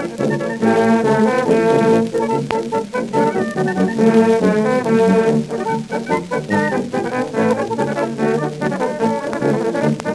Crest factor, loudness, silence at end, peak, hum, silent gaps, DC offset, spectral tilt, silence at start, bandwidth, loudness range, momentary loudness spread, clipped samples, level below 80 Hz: 16 dB; -17 LUFS; 0 s; 0 dBFS; none; none; under 0.1%; -6.5 dB/octave; 0 s; 12 kHz; 3 LU; 7 LU; under 0.1%; -54 dBFS